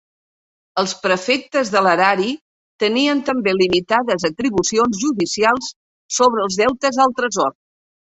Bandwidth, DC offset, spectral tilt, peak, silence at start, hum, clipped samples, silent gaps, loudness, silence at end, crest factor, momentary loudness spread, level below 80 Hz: 8.4 kHz; under 0.1%; -3.5 dB/octave; -2 dBFS; 0.75 s; none; under 0.1%; 2.41-2.79 s, 5.76-6.09 s; -17 LUFS; 0.6 s; 16 dB; 7 LU; -56 dBFS